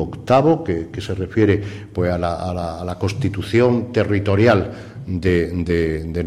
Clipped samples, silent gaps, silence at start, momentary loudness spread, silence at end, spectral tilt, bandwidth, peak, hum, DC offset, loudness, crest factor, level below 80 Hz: under 0.1%; none; 0 s; 11 LU; 0 s; -7.5 dB/octave; 12 kHz; -2 dBFS; none; under 0.1%; -19 LUFS; 16 dB; -38 dBFS